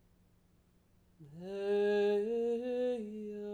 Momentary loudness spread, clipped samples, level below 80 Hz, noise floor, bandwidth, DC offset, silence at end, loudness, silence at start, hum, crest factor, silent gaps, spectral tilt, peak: 13 LU; under 0.1%; -74 dBFS; -69 dBFS; 9.2 kHz; under 0.1%; 0 s; -35 LUFS; 1.2 s; none; 14 dB; none; -6.5 dB/octave; -24 dBFS